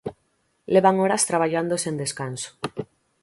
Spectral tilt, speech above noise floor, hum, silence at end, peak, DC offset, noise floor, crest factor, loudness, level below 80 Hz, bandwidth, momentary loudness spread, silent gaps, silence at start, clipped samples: -4 dB/octave; 47 dB; none; 0.4 s; -4 dBFS; under 0.1%; -69 dBFS; 20 dB; -23 LUFS; -64 dBFS; 12 kHz; 16 LU; none; 0.05 s; under 0.1%